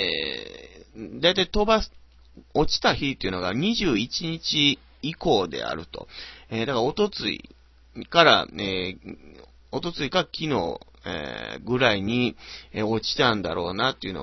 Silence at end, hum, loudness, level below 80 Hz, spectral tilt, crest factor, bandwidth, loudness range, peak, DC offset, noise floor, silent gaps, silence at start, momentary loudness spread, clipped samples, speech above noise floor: 0 s; none; -24 LUFS; -44 dBFS; -4.5 dB/octave; 26 dB; 6.2 kHz; 3 LU; 0 dBFS; under 0.1%; -51 dBFS; none; 0 s; 17 LU; under 0.1%; 26 dB